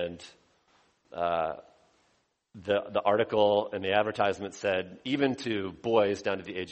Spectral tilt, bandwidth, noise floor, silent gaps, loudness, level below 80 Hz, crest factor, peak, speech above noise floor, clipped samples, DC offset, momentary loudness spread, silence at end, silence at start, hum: -5.5 dB/octave; 8.4 kHz; -72 dBFS; none; -29 LUFS; -66 dBFS; 20 dB; -10 dBFS; 43 dB; under 0.1%; under 0.1%; 10 LU; 0 s; 0 s; none